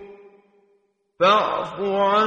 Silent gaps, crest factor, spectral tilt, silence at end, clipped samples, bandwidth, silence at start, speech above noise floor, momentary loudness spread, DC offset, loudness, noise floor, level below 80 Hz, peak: none; 18 dB; -5 dB/octave; 0 s; under 0.1%; 8.6 kHz; 0 s; 46 dB; 8 LU; under 0.1%; -20 LUFS; -65 dBFS; -64 dBFS; -4 dBFS